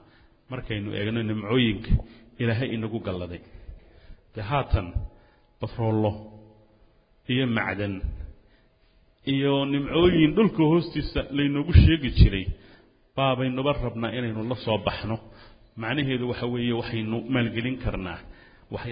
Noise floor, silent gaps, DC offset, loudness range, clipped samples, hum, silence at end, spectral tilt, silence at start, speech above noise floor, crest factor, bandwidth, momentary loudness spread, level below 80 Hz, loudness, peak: -60 dBFS; none; under 0.1%; 9 LU; under 0.1%; none; 0 s; -11.5 dB/octave; 0.5 s; 36 dB; 22 dB; 5.2 kHz; 16 LU; -34 dBFS; -25 LUFS; -2 dBFS